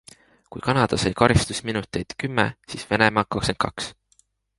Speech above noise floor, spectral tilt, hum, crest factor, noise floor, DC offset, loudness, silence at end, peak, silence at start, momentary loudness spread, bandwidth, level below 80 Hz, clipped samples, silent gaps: 41 dB; -5 dB/octave; none; 22 dB; -63 dBFS; under 0.1%; -23 LUFS; 0.65 s; -2 dBFS; 0.5 s; 13 LU; 11.5 kHz; -42 dBFS; under 0.1%; none